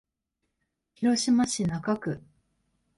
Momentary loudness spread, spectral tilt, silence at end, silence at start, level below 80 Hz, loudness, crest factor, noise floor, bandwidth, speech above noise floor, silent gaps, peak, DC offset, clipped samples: 10 LU; -4.5 dB/octave; 0.8 s; 1 s; -60 dBFS; -27 LUFS; 16 dB; -82 dBFS; 11.5 kHz; 56 dB; none; -14 dBFS; under 0.1%; under 0.1%